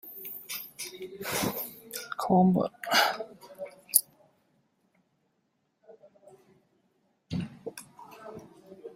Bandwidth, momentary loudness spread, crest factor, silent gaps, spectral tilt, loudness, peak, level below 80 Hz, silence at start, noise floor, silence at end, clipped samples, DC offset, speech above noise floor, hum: 16 kHz; 22 LU; 32 dB; none; -3.5 dB/octave; -29 LUFS; 0 dBFS; -68 dBFS; 0.05 s; -76 dBFS; 0 s; under 0.1%; under 0.1%; 50 dB; none